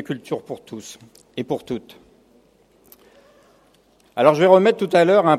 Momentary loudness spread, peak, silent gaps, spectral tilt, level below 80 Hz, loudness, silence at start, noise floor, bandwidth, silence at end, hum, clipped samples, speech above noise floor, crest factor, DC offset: 22 LU; 0 dBFS; none; -6 dB/octave; -66 dBFS; -18 LUFS; 0 s; -57 dBFS; 14.5 kHz; 0 s; none; under 0.1%; 38 dB; 20 dB; under 0.1%